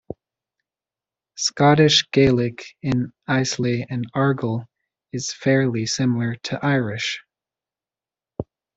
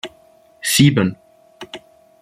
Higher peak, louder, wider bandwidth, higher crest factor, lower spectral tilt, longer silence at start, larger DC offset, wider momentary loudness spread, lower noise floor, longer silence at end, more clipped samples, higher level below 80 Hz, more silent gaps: about the same, -2 dBFS vs -2 dBFS; second, -21 LUFS vs -16 LUFS; second, 8.2 kHz vs 16 kHz; about the same, 20 dB vs 18 dB; about the same, -5 dB/octave vs -4.5 dB/octave; about the same, 0.1 s vs 0.05 s; neither; second, 18 LU vs 22 LU; first, under -90 dBFS vs -51 dBFS; about the same, 0.35 s vs 0.45 s; neither; about the same, -54 dBFS vs -52 dBFS; neither